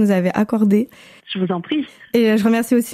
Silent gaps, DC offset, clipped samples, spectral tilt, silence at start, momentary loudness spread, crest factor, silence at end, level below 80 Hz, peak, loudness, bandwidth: none; under 0.1%; under 0.1%; -6.5 dB/octave; 0 s; 9 LU; 14 dB; 0 s; -60 dBFS; -4 dBFS; -18 LUFS; 16 kHz